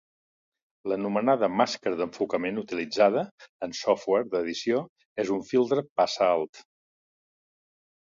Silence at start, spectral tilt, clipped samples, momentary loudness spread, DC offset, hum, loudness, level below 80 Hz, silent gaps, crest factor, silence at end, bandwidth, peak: 0.85 s; -5 dB/octave; under 0.1%; 10 LU; under 0.1%; none; -27 LUFS; -70 dBFS; 3.31-3.38 s, 3.49-3.60 s, 4.89-4.96 s, 5.05-5.16 s, 5.89-5.96 s, 6.49-6.53 s; 22 dB; 1.4 s; 7.6 kHz; -6 dBFS